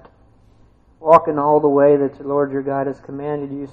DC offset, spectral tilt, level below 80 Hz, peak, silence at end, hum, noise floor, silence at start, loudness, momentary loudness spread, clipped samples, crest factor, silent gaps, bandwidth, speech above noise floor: under 0.1%; -9.5 dB/octave; -54 dBFS; 0 dBFS; 0.05 s; none; -51 dBFS; 1 s; -17 LUFS; 13 LU; under 0.1%; 18 dB; none; 5.6 kHz; 35 dB